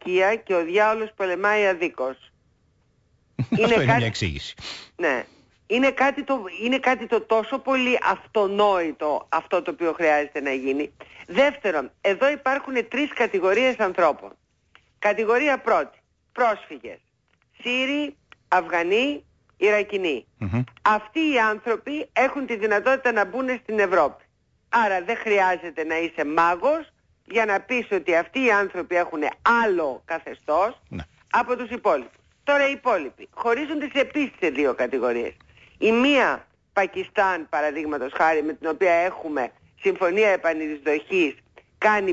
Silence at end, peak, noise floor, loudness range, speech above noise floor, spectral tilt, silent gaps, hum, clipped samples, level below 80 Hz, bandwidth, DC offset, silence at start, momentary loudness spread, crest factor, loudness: 0 s; -8 dBFS; -66 dBFS; 2 LU; 44 dB; -5.5 dB/octave; none; none; under 0.1%; -56 dBFS; 8 kHz; under 0.1%; 0.05 s; 8 LU; 16 dB; -23 LUFS